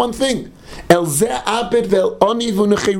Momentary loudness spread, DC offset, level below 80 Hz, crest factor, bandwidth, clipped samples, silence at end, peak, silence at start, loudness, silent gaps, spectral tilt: 8 LU; under 0.1%; -42 dBFS; 16 dB; 19.5 kHz; 0.1%; 0 s; 0 dBFS; 0 s; -16 LUFS; none; -4.5 dB/octave